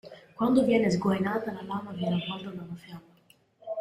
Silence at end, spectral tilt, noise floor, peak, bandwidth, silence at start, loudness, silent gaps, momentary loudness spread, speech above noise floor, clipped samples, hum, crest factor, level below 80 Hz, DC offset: 0 s; -6.5 dB/octave; -63 dBFS; -10 dBFS; 13.5 kHz; 0.05 s; -28 LUFS; none; 23 LU; 35 dB; under 0.1%; none; 18 dB; -64 dBFS; under 0.1%